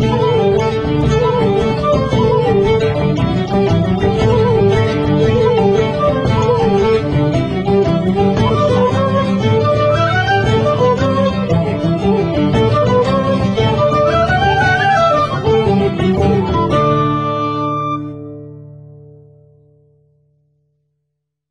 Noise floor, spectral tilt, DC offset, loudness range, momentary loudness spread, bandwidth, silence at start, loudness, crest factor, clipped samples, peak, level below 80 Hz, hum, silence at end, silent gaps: -74 dBFS; -7.5 dB/octave; under 0.1%; 4 LU; 4 LU; 9.6 kHz; 0 s; -14 LUFS; 12 dB; under 0.1%; -2 dBFS; -32 dBFS; none; 2.65 s; none